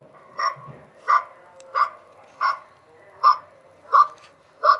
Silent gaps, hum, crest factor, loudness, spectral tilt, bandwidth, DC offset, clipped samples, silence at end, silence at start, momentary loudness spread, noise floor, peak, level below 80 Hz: none; none; 20 dB; -22 LUFS; -2.5 dB/octave; 8.2 kHz; under 0.1%; under 0.1%; 0 s; 0.4 s; 16 LU; -51 dBFS; -4 dBFS; -80 dBFS